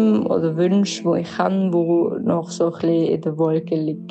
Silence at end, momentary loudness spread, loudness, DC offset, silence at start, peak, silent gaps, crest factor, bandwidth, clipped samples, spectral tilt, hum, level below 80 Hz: 0 s; 4 LU; -20 LUFS; under 0.1%; 0 s; -6 dBFS; none; 14 dB; 8.6 kHz; under 0.1%; -7 dB/octave; none; -66 dBFS